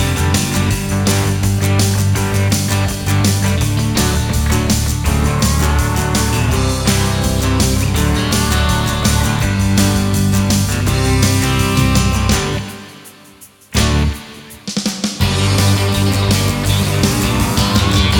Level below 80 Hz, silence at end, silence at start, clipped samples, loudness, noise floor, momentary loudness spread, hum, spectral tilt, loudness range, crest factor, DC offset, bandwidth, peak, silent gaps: -22 dBFS; 0 s; 0 s; under 0.1%; -15 LUFS; -42 dBFS; 4 LU; none; -4.5 dB/octave; 3 LU; 14 dB; under 0.1%; 18.5 kHz; 0 dBFS; none